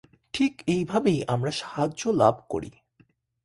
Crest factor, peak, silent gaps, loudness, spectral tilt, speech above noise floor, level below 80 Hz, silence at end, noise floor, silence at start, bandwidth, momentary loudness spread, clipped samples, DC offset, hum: 22 dB; -6 dBFS; none; -26 LUFS; -6 dB/octave; 39 dB; -58 dBFS; 0.75 s; -63 dBFS; 0.35 s; 11.5 kHz; 12 LU; under 0.1%; under 0.1%; none